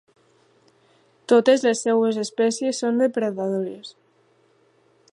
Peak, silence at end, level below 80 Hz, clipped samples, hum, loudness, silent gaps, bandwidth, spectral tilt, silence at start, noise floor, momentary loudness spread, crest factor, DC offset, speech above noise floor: -4 dBFS; 1.25 s; -80 dBFS; under 0.1%; none; -21 LUFS; none; 11.5 kHz; -4.5 dB/octave; 1.3 s; -61 dBFS; 16 LU; 20 dB; under 0.1%; 41 dB